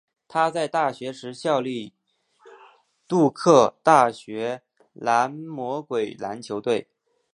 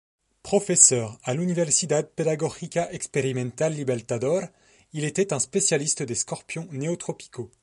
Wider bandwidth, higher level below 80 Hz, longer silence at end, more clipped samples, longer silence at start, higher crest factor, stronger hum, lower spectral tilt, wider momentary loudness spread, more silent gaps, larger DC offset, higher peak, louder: about the same, 11 kHz vs 11.5 kHz; second, -74 dBFS vs -64 dBFS; first, 0.5 s vs 0.15 s; neither; second, 0.3 s vs 0.45 s; about the same, 22 dB vs 24 dB; neither; first, -5.5 dB/octave vs -3.5 dB/octave; about the same, 16 LU vs 14 LU; neither; neither; about the same, -2 dBFS vs -2 dBFS; about the same, -23 LUFS vs -24 LUFS